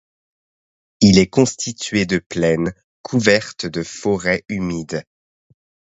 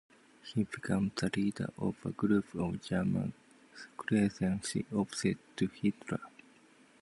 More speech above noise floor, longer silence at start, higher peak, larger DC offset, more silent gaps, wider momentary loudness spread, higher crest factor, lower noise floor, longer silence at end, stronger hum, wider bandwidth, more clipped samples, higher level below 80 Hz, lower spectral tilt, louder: first, over 72 dB vs 29 dB; first, 1 s vs 0.45 s; first, 0 dBFS vs -16 dBFS; neither; first, 2.26-2.30 s, 2.84-3.04 s vs none; first, 13 LU vs 10 LU; about the same, 20 dB vs 18 dB; first, under -90 dBFS vs -62 dBFS; first, 0.9 s vs 0.7 s; neither; second, 8.2 kHz vs 11.5 kHz; neither; first, -46 dBFS vs -60 dBFS; about the same, -5 dB/octave vs -6 dB/octave; first, -18 LUFS vs -35 LUFS